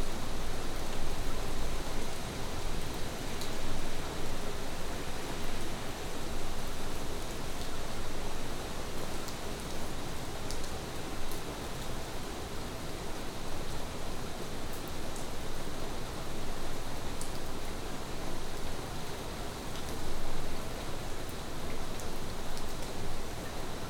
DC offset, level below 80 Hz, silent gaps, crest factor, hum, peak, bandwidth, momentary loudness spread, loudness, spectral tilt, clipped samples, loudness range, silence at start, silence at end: under 0.1%; -38 dBFS; none; 12 dB; none; -18 dBFS; 16 kHz; 2 LU; -40 LUFS; -4 dB/octave; under 0.1%; 2 LU; 0 s; 0 s